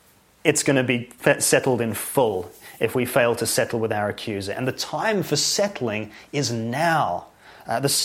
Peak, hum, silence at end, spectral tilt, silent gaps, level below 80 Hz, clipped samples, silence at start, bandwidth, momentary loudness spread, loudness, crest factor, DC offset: 0 dBFS; none; 0 s; -3.5 dB/octave; none; -60 dBFS; under 0.1%; 0.45 s; 16.5 kHz; 9 LU; -22 LUFS; 22 dB; under 0.1%